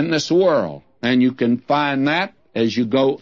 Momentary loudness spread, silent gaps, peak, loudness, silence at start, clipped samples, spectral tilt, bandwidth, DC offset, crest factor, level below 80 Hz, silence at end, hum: 7 LU; none; -4 dBFS; -19 LUFS; 0 s; under 0.1%; -5.5 dB/octave; 7.6 kHz; 0.1%; 14 dB; -62 dBFS; 0.05 s; none